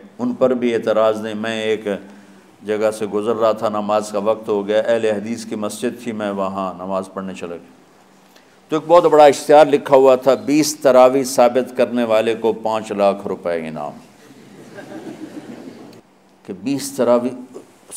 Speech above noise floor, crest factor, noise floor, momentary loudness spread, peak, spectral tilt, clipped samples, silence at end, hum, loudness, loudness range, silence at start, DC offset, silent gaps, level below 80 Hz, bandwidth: 33 dB; 18 dB; -49 dBFS; 21 LU; 0 dBFS; -4.5 dB/octave; under 0.1%; 0 s; none; -17 LUFS; 13 LU; 0.05 s; under 0.1%; none; -66 dBFS; 16 kHz